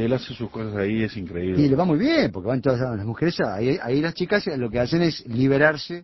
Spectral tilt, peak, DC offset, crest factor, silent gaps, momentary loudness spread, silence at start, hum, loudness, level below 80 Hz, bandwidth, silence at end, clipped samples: -7.5 dB/octave; -4 dBFS; under 0.1%; 20 dB; none; 8 LU; 0 s; none; -23 LUFS; -48 dBFS; 6 kHz; 0 s; under 0.1%